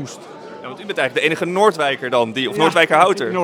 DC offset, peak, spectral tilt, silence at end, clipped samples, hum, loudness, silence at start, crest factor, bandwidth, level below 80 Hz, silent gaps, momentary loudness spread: under 0.1%; 0 dBFS; -4 dB/octave; 0 s; under 0.1%; none; -16 LUFS; 0 s; 18 dB; 17.5 kHz; -70 dBFS; none; 20 LU